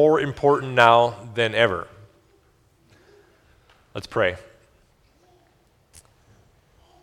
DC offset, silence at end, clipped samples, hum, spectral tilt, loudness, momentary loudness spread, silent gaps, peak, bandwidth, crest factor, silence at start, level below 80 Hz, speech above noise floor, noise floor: under 0.1%; 2.6 s; under 0.1%; none; -5.5 dB/octave; -20 LUFS; 22 LU; none; 0 dBFS; 13 kHz; 24 dB; 0 s; -58 dBFS; 41 dB; -61 dBFS